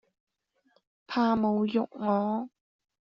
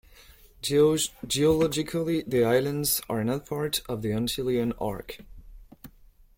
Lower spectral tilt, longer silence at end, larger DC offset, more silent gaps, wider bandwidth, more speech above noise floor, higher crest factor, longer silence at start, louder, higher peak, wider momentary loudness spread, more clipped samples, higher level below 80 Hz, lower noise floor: about the same, -5.5 dB/octave vs -4.5 dB/octave; about the same, 0.6 s vs 0.5 s; neither; neither; second, 6.2 kHz vs 16.5 kHz; first, 43 dB vs 29 dB; about the same, 16 dB vs 18 dB; first, 1.1 s vs 0.65 s; about the same, -28 LUFS vs -26 LUFS; second, -14 dBFS vs -10 dBFS; about the same, 9 LU vs 10 LU; neither; second, -68 dBFS vs -50 dBFS; first, -70 dBFS vs -55 dBFS